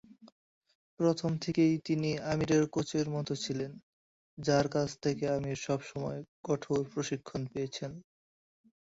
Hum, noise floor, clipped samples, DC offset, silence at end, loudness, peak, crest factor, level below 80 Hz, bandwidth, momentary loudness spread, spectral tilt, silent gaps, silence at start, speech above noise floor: none; under -90 dBFS; under 0.1%; under 0.1%; 0.8 s; -33 LUFS; -16 dBFS; 18 dB; -64 dBFS; 8 kHz; 10 LU; -6 dB/octave; 0.32-0.61 s, 0.75-0.97 s, 3.83-4.37 s, 6.28-6.44 s; 0.1 s; over 58 dB